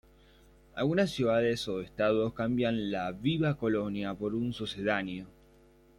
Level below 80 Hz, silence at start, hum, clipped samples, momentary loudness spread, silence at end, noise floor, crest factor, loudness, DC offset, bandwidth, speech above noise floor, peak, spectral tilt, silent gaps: -58 dBFS; 0.75 s; none; under 0.1%; 7 LU; 0.7 s; -60 dBFS; 18 dB; -31 LUFS; under 0.1%; 16.5 kHz; 30 dB; -14 dBFS; -6.5 dB/octave; none